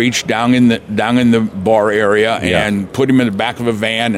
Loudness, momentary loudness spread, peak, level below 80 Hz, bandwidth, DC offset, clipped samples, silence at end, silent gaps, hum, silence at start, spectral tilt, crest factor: -13 LUFS; 5 LU; -2 dBFS; -46 dBFS; 14 kHz; under 0.1%; under 0.1%; 0 s; none; none; 0 s; -5 dB/octave; 12 dB